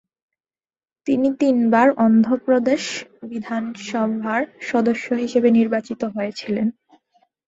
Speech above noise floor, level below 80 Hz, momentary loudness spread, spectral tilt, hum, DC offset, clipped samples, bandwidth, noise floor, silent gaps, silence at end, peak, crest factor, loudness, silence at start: over 71 dB; -64 dBFS; 11 LU; -5.5 dB/octave; none; under 0.1%; under 0.1%; 7.8 kHz; under -90 dBFS; none; 0.75 s; -2 dBFS; 18 dB; -20 LUFS; 1.05 s